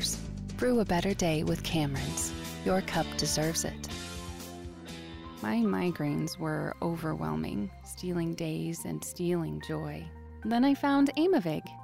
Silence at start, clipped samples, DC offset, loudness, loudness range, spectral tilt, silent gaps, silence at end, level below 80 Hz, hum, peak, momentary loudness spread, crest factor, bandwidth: 0 s; under 0.1%; under 0.1%; -31 LUFS; 4 LU; -5 dB/octave; none; 0 s; -48 dBFS; none; -16 dBFS; 14 LU; 14 dB; 16 kHz